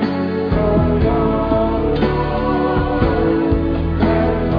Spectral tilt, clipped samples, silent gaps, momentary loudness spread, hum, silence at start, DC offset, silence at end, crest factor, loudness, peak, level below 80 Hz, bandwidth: -10 dB/octave; under 0.1%; none; 3 LU; none; 0 s; under 0.1%; 0 s; 14 dB; -17 LUFS; -2 dBFS; -24 dBFS; 5.2 kHz